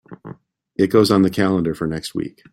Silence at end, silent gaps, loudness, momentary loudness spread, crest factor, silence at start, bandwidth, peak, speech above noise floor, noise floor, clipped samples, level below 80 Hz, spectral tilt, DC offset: 0.2 s; none; -18 LUFS; 19 LU; 18 dB; 0.1 s; 16 kHz; -2 dBFS; 24 dB; -42 dBFS; under 0.1%; -52 dBFS; -6.5 dB/octave; under 0.1%